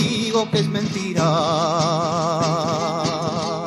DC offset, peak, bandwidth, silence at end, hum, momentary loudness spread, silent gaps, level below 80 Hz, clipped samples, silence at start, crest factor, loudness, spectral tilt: under 0.1%; -6 dBFS; 12 kHz; 0 s; none; 4 LU; none; -56 dBFS; under 0.1%; 0 s; 14 dB; -20 LUFS; -5 dB/octave